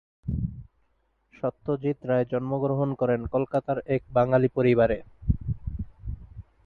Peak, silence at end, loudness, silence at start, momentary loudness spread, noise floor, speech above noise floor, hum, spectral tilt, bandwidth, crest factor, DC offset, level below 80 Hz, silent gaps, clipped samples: -8 dBFS; 0.25 s; -27 LUFS; 0.25 s; 15 LU; -70 dBFS; 45 dB; none; -10.5 dB/octave; 4.5 kHz; 18 dB; under 0.1%; -40 dBFS; none; under 0.1%